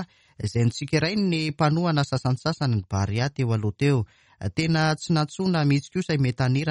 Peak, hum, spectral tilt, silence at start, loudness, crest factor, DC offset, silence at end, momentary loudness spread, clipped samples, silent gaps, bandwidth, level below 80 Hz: -8 dBFS; none; -6.5 dB/octave; 0 s; -24 LUFS; 16 dB; under 0.1%; 0 s; 5 LU; under 0.1%; none; 11 kHz; -52 dBFS